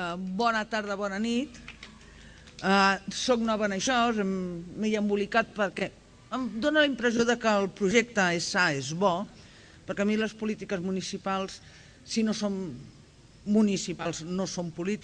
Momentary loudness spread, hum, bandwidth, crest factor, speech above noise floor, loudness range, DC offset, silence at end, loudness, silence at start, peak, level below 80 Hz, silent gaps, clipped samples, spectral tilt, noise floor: 13 LU; none; 10 kHz; 20 dB; 26 dB; 5 LU; under 0.1%; 0 s; -28 LUFS; 0 s; -8 dBFS; -58 dBFS; none; under 0.1%; -4.5 dB/octave; -54 dBFS